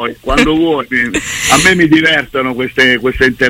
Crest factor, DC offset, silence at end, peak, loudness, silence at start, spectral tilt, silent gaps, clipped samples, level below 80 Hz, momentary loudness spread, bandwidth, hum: 12 dB; under 0.1%; 0 s; 0 dBFS; -10 LUFS; 0 s; -3.5 dB/octave; none; under 0.1%; -30 dBFS; 7 LU; 16.5 kHz; none